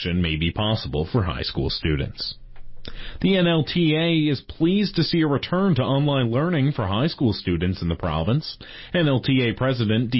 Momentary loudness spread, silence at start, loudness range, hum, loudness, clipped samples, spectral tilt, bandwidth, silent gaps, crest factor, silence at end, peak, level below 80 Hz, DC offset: 8 LU; 0 s; 3 LU; none; -22 LUFS; under 0.1%; -11 dB/octave; 5.8 kHz; none; 14 dB; 0 s; -8 dBFS; -38 dBFS; under 0.1%